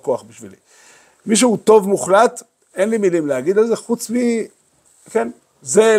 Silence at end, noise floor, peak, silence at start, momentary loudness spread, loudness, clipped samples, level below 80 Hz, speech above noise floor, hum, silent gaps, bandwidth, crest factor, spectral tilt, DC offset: 0 s; -55 dBFS; 0 dBFS; 0.05 s; 17 LU; -17 LUFS; under 0.1%; -66 dBFS; 39 dB; none; none; 15.5 kHz; 16 dB; -4 dB/octave; under 0.1%